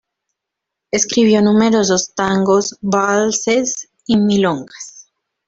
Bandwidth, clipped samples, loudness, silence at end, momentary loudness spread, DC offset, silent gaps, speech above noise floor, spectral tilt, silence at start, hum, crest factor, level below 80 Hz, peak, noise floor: 7.8 kHz; under 0.1%; -15 LUFS; 0.45 s; 12 LU; under 0.1%; none; 66 dB; -4 dB/octave; 0.95 s; none; 16 dB; -54 dBFS; -2 dBFS; -81 dBFS